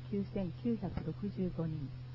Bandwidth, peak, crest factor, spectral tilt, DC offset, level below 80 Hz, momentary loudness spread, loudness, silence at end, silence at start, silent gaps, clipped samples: 5.8 kHz; -24 dBFS; 14 dB; -9 dB/octave; under 0.1%; -54 dBFS; 3 LU; -39 LUFS; 0 s; 0 s; none; under 0.1%